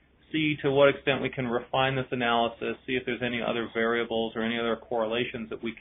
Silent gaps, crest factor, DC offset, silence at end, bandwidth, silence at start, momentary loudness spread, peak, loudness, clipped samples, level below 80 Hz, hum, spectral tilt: none; 20 dB; under 0.1%; 0 s; 3.9 kHz; 0.3 s; 9 LU; -8 dBFS; -28 LUFS; under 0.1%; -58 dBFS; none; -2 dB/octave